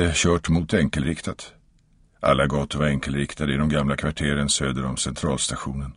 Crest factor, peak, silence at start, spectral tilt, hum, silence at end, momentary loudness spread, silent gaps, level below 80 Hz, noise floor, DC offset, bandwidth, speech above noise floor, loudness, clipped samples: 18 dB; -4 dBFS; 0 s; -4.5 dB/octave; none; 0.05 s; 7 LU; none; -36 dBFS; -58 dBFS; under 0.1%; 11 kHz; 35 dB; -23 LUFS; under 0.1%